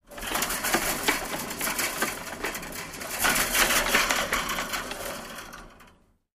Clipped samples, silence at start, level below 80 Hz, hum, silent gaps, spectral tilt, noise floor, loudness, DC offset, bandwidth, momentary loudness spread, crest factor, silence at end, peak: under 0.1%; 0.1 s; -46 dBFS; none; none; -1 dB/octave; -58 dBFS; -26 LUFS; under 0.1%; 15.5 kHz; 14 LU; 22 dB; 0.45 s; -6 dBFS